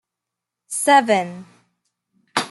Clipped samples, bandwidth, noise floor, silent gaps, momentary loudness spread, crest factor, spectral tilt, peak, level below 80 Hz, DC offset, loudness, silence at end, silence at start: under 0.1%; 12.5 kHz; -84 dBFS; none; 17 LU; 20 dB; -2.5 dB/octave; -2 dBFS; -72 dBFS; under 0.1%; -18 LUFS; 0 s; 0.7 s